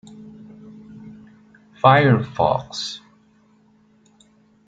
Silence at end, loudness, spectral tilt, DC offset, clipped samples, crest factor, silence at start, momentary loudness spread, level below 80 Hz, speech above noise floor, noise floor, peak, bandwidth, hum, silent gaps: 1.7 s; -18 LUFS; -6 dB/octave; under 0.1%; under 0.1%; 22 dB; 0.2 s; 28 LU; -56 dBFS; 39 dB; -56 dBFS; -2 dBFS; 7.8 kHz; none; none